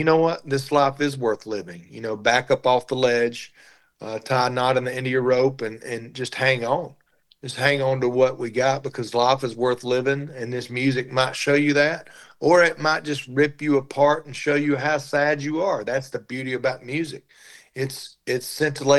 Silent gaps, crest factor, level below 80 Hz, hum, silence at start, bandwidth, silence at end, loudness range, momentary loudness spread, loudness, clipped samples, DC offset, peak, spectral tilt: none; 18 dB; -66 dBFS; none; 0 s; 12.5 kHz; 0 s; 4 LU; 13 LU; -22 LUFS; under 0.1%; under 0.1%; -4 dBFS; -5 dB/octave